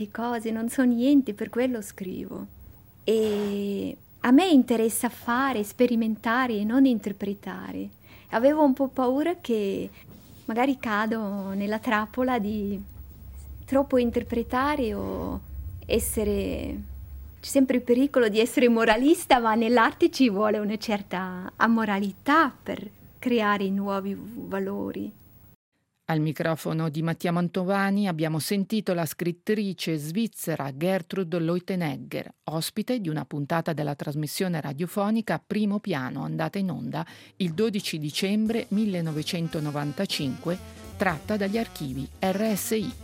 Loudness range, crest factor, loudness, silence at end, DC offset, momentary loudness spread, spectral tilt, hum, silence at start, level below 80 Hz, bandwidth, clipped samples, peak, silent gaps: 6 LU; 20 dB; -26 LUFS; 0 s; under 0.1%; 14 LU; -5.5 dB/octave; none; 0 s; -50 dBFS; 17 kHz; under 0.1%; -6 dBFS; 25.55-25.72 s